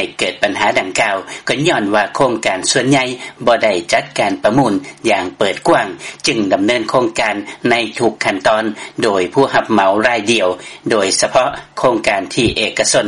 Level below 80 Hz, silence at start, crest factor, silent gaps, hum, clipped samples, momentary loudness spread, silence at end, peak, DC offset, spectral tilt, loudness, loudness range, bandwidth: -46 dBFS; 0 s; 14 dB; none; none; under 0.1%; 6 LU; 0 s; 0 dBFS; under 0.1%; -3.5 dB/octave; -15 LUFS; 1 LU; 11.5 kHz